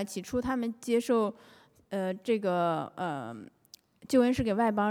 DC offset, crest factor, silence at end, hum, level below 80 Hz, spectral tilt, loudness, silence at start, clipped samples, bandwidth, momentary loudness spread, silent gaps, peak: under 0.1%; 16 dB; 0 s; none; -58 dBFS; -6 dB/octave; -30 LUFS; 0 s; under 0.1%; 16.5 kHz; 10 LU; none; -14 dBFS